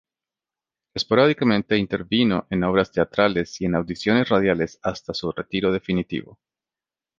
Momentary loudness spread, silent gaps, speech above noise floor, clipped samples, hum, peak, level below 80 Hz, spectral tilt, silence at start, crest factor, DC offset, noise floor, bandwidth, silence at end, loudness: 10 LU; none; over 69 dB; under 0.1%; none; -2 dBFS; -50 dBFS; -6 dB/octave; 0.95 s; 20 dB; under 0.1%; under -90 dBFS; 7.6 kHz; 0.95 s; -22 LUFS